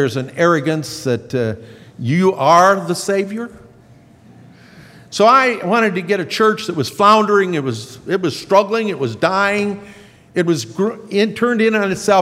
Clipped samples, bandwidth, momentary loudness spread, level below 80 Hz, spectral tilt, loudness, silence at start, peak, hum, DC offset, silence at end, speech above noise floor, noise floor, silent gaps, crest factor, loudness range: under 0.1%; 16 kHz; 12 LU; -60 dBFS; -5 dB/octave; -16 LUFS; 0 s; 0 dBFS; none; under 0.1%; 0 s; 30 dB; -45 dBFS; none; 16 dB; 3 LU